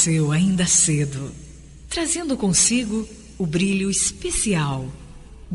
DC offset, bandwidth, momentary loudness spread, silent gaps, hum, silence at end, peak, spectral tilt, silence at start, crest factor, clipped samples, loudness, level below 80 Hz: under 0.1%; 11.5 kHz; 14 LU; none; none; 0 s; -6 dBFS; -3.5 dB/octave; 0 s; 16 dB; under 0.1%; -20 LUFS; -42 dBFS